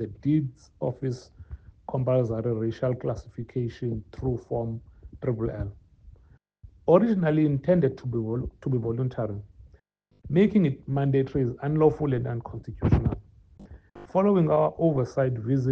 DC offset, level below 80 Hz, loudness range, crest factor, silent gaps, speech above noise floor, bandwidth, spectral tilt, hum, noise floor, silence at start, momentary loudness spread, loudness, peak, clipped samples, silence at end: under 0.1%; -46 dBFS; 6 LU; 22 dB; none; 38 dB; 6.8 kHz; -10 dB/octave; none; -63 dBFS; 0 s; 13 LU; -26 LUFS; -4 dBFS; under 0.1%; 0 s